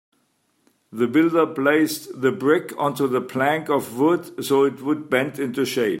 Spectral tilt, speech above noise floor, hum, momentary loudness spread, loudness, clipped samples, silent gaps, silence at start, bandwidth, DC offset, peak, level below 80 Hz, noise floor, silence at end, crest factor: -5.5 dB/octave; 46 dB; none; 6 LU; -21 LUFS; under 0.1%; none; 0.9 s; 16.5 kHz; under 0.1%; -4 dBFS; -68 dBFS; -67 dBFS; 0 s; 18 dB